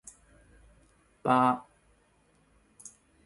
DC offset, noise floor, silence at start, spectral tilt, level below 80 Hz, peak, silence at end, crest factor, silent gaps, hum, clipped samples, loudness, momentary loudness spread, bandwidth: under 0.1%; -67 dBFS; 1.25 s; -6 dB/octave; -66 dBFS; -10 dBFS; 0.35 s; 24 dB; none; none; under 0.1%; -27 LUFS; 25 LU; 11.5 kHz